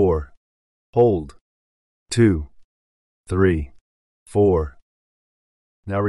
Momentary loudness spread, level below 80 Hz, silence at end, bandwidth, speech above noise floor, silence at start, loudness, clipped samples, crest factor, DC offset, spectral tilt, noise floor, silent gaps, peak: 21 LU; -38 dBFS; 0 s; 11.5 kHz; over 72 dB; 0 s; -20 LUFS; under 0.1%; 18 dB; under 0.1%; -7.5 dB/octave; under -90 dBFS; 0.37-0.93 s, 1.41-2.06 s, 2.64-3.24 s, 3.81-4.26 s, 4.82-5.83 s; -4 dBFS